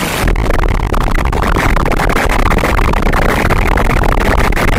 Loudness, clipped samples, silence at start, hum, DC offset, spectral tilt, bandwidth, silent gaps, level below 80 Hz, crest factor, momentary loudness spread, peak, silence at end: -13 LUFS; under 0.1%; 0 s; none; under 0.1%; -5.5 dB/octave; 16 kHz; none; -14 dBFS; 10 dB; 3 LU; 0 dBFS; 0 s